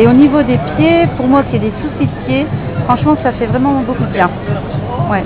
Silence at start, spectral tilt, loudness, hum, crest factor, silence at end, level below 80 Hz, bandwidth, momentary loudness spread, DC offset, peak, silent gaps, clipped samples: 0 s; -11.5 dB/octave; -13 LUFS; none; 12 dB; 0 s; -32 dBFS; 4 kHz; 8 LU; under 0.1%; 0 dBFS; none; under 0.1%